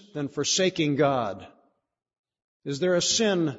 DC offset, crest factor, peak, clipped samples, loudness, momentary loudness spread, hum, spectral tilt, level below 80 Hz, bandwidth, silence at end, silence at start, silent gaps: under 0.1%; 18 dB; -10 dBFS; under 0.1%; -25 LUFS; 13 LU; none; -3.5 dB/octave; -66 dBFS; 8 kHz; 0 s; 0.15 s; 2.19-2.24 s, 2.44-2.60 s